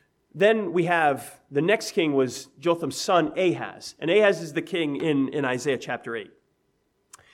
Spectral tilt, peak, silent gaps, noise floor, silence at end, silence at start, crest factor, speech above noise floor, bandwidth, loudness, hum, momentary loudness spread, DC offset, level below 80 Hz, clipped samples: -5 dB/octave; -8 dBFS; none; -71 dBFS; 1.05 s; 0.35 s; 18 dB; 46 dB; 15.5 kHz; -24 LUFS; none; 11 LU; under 0.1%; -72 dBFS; under 0.1%